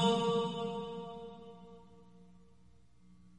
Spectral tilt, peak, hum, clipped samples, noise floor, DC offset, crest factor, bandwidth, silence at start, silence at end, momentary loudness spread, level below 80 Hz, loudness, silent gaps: -5.5 dB/octave; -18 dBFS; 60 Hz at -65 dBFS; under 0.1%; -65 dBFS; under 0.1%; 20 dB; 11 kHz; 0 s; 1.15 s; 24 LU; -68 dBFS; -36 LUFS; none